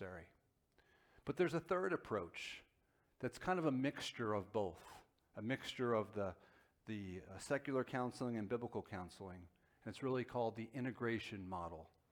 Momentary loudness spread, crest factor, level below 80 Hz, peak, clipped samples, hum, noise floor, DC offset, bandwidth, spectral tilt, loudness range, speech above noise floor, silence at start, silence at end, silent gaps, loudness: 16 LU; 20 dB; -72 dBFS; -24 dBFS; under 0.1%; none; -79 dBFS; under 0.1%; 18.5 kHz; -6 dB/octave; 3 LU; 36 dB; 0 s; 0.25 s; none; -43 LUFS